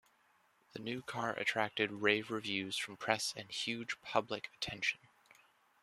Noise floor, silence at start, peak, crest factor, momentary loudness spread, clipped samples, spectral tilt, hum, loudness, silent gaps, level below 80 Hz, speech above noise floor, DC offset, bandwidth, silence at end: -72 dBFS; 0.75 s; -12 dBFS; 28 dB; 10 LU; under 0.1%; -3 dB/octave; none; -37 LUFS; none; -74 dBFS; 34 dB; under 0.1%; 14 kHz; 0.85 s